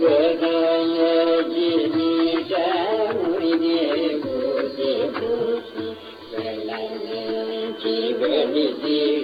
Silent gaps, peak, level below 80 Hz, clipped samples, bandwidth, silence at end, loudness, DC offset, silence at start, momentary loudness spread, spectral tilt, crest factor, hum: none; -8 dBFS; -66 dBFS; under 0.1%; 5 kHz; 0 s; -22 LUFS; under 0.1%; 0 s; 10 LU; -7 dB/octave; 14 dB; none